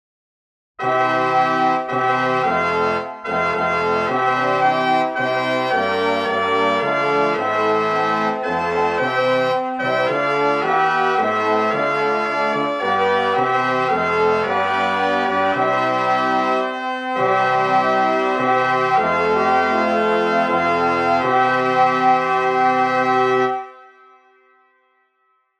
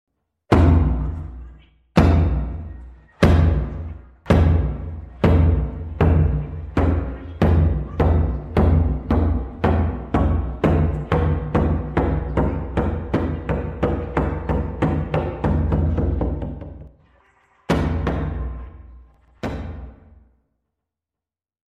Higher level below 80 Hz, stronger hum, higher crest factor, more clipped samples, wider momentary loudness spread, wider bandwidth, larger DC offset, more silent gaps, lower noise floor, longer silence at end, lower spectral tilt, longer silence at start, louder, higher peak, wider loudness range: second, -60 dBFS vs -26 dBFS; neither; about the same, 14 dB vs 16 dB; neither; second, 3 LU vs 16 LU; first, 9.8 kHz vs 6.4 kHz; neither; neither; second, -65 dBFS vs -89 dBFS; about the same, 1.75 s vs 1.85 s; second, -5 dB/octave vs -9 dB/octave; first, 0.8 s vs 0.5 s; first, -18 LUFS vs -21 LUFS; about the same, -4 dBFS vs -4 dBFS; second, 2 LU vs 8 LU